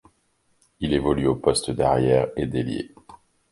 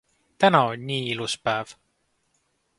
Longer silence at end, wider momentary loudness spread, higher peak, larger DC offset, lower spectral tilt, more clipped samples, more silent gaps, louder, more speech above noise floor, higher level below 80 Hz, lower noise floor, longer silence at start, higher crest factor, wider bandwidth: second, 0.35 s vs 1.05 s; about the same, 11 LU vs 10 LU; about the same, -4 dBFS vs -2 dBFS; neither; about the same, -5.5 dB/octave vs -4.5 dB/octave; neither; neither; about the same, -23 LUFS vs -23 LUFS; about the same, 45 dB vs 48 dB; first, -44 dBFS vs -66 dBFS; second, -67 dBFS vs -71 dBFS; first, 0.8 s vs 0.4 s; about the same, 20 dB vs 24 dB; about the same, 11.5 kHz vs 11.5 kHz